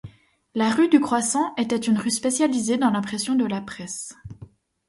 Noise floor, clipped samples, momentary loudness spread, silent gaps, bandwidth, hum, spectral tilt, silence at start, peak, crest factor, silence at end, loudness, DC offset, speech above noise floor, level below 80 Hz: -47 dBFS; under 0.1%; 14 LU; none; 11.5 kHz; none; -4 dB/octave; 0.05 s; -4 dBFS; 18 dB; 0.45 s; -22 LUFS; under 0.1%; 25 dB; -58 dBFS